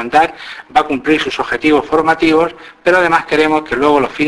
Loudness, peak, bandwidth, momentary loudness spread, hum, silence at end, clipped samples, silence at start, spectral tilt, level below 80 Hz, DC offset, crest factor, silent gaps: -13 LUFS; 0 dBFS; 11 kHz; 6 LU; none; 0 s; under 0.1%; 0 s; -5 dB/octave; -44 dBFS; under 0.1%; 14 dB; none